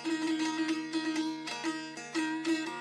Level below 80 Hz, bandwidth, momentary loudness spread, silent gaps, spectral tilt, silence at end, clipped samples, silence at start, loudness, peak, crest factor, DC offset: -86 dBFS; 12 kHz; 5 LU; none; -3 dB/octave; 0 s; under 0.1%; 0 s; -34 LUFS; -20 dBFS; 14 dB; under 0.1%